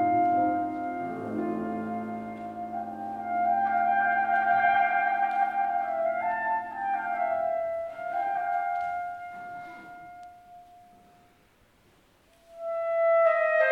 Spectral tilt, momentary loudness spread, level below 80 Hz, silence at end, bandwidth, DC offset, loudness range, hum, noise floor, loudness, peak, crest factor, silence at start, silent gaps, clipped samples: -7 dB/octave; 17 LU; -68 dBFS; 0 s; 5.4 kHz; under 0.1%; 14 LU; none; -62 dBFS; -27 LUFS; -12 dBFS; 16 dB; 0 s; none; under 0.1%